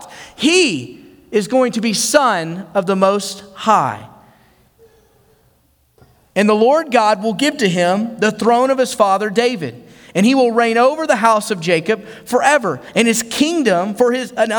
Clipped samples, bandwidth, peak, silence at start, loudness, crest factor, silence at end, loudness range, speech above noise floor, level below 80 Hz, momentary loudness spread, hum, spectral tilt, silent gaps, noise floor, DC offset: under 0.1%; over 20 kHz; 0 dBFS; 0 s; -15 LUFS; 16 dB; 0 s; 5 LU; 42 dB; -60 dBFS; 8 LU; none; -4 dB/octave; none; -57 dBFS; under 0.1%